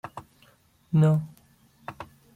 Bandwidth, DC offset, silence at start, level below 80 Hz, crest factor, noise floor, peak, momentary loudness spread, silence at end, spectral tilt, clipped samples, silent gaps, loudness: 8 kHz; under 0.1%; 0.05 s; -62 dBFS; 16 dB; -60 dBFS; -12 dBFS; 23 LU; 0.3 s; -9 dB/octave; under 0.1%; none; -24 LUFS